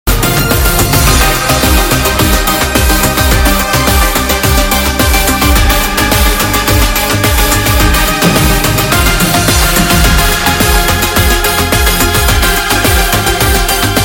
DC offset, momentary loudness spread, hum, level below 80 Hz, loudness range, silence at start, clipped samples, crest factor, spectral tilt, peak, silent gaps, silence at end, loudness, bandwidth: under 0.1%; 2 LU; none; -14 dBFS; 1 LU; 0.05 s; 0.3%; 8 dB; -3.5 dB/octave; 0 dBFS; none; 0 s; -9 LUFS; 17.5 kHz